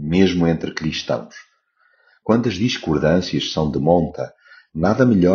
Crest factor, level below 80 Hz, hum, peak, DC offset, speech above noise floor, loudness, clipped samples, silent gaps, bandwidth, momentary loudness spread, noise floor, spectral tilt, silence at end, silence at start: 18 dB; -42 dBFS; none; -2 dBFS; under 0.1%; 43 dB; -19 LUFS; under 0.1%; none; 7 kHz; 14 LU; -61 dBFS; -5.5 dB/octave; 0 s; 0 s